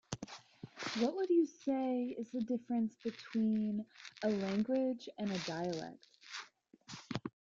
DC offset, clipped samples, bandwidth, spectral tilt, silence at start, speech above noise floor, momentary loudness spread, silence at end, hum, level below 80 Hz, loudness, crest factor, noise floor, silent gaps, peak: under 0.1%; under 0.1%; 7.6 kHz; -5.5 dB/octave; 0.1 s; 24 dB; 17 LU; 0.25 s; none; -74 dBFS; -38 LUFS; 18 dB; -60 dBFS; none; -20 dBFS